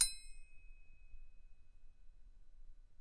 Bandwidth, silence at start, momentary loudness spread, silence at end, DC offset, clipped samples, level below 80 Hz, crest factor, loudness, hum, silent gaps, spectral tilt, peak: 11.5 kHz; 0 s; 20 LU; 0.05 s; under 0.1%; under 0.1%; -56 dBFS; 28 dB; -38 LUFS; none; none; 2 dB/octave; -18 dBFS